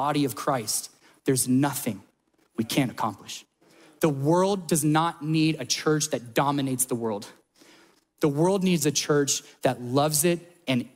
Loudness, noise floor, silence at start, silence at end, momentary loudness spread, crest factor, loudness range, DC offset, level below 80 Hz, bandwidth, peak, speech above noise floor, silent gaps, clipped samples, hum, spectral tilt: -25 LUFS; -65 dBFS; 0 s; 0.1 s; 10 LU; 18 dB; 3 LU; under 0.1%; -66 dBFS; 16 kHz; -8 dBFS; 40 dB; none; under 0.1%; none; -4.5 dB/octave